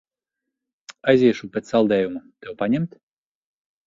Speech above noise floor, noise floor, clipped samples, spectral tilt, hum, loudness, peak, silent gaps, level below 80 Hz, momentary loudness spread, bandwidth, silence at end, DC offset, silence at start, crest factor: 64 dB; -84 dBFS; under 0.1%; -7 dB/octave; none; -21 LUFS; -4 dBFS; none; -60 dBFS; 14 LU; 7.6 kHz; 1 s; under 0.1%; 0.9 s; 20 dB